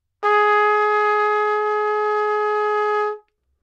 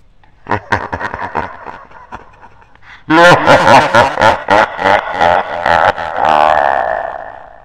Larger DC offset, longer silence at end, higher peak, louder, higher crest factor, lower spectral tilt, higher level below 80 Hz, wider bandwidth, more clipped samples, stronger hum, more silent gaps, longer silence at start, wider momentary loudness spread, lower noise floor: second, under 0.1% vs 0.5%; first, 0.45 s vs 0.2 s; second, -6 dBFS vs 0 dBFS; second, -19 LUFS vs -11 LUFS; about the same, 14 dB vs 12 dB; second, -1.5 dB/octave vs -4.5 dB/octave; second, -78 dBFS vs -40 dBFS; second, 7.4 kHz vs 16.5 kHz; second, under 0.1% vs 0.8%; neither; neither; second, 0.2 s vs 0.5 s; second, 5 LU vs 16 LU; about the same, -40 dBFS vs -40 dBFS